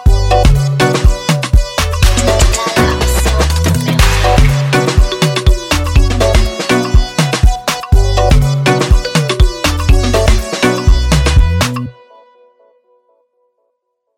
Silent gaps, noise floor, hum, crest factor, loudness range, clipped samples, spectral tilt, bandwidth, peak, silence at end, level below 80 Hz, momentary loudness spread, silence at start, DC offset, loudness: none; -68 dBFS; none; 10 dB; 3 LU; 0.5%; -5 dB/octave; 16.5 kHz; 0 dBFS; 2.25 s; -14 dBFS; 3 LU; 0 s; under 0.1%; -12 LUFS